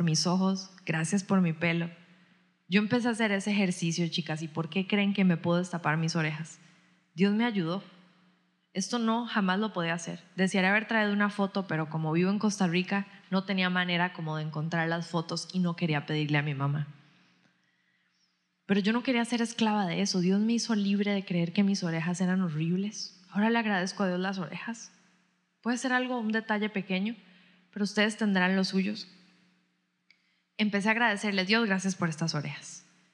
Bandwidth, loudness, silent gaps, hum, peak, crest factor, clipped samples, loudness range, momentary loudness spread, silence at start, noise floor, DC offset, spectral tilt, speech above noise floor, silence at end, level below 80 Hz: 11 kHz; -29 LUFS; none; none; -10 dBFS; 20 dB; under 0.1%; 4 LU; 9 LU; 0 s; -75 dBFS; under 0.1%; -5 dB/octave; 46 dB; 0.35 s; under -90 dBFS